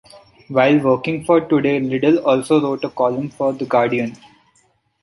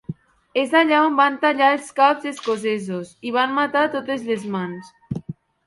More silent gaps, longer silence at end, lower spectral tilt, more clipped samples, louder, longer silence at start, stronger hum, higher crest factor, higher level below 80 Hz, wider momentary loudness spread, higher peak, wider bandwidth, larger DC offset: neither; first, 0.9 s vs 0.35 s; first, -7 dB/octave vs -5 dB/octave; neither; first, -17 LUFS vs -20 LUFS; about the same, 0.15 s vs 0.1 s; neither; about the same, 16 dB vs 18 dB; about the same, -58 dBFS vs -60 dBFS; second, 7 LU vs 16 LU; about the same, -2 dBFS vs -2 dBFS; about the same, 11.5 kHz vs 11.5 kHz; neither